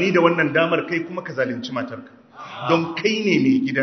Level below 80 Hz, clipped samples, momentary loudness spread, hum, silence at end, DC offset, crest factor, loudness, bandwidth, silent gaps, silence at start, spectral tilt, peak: -66 dBFS; under 0.1%; 15 LU; none; 0 s; under 0.1%; 20 dB; -20 LUFS; 6.4 kHz; none; 0 s; -6 dB/octave; 0 dBFS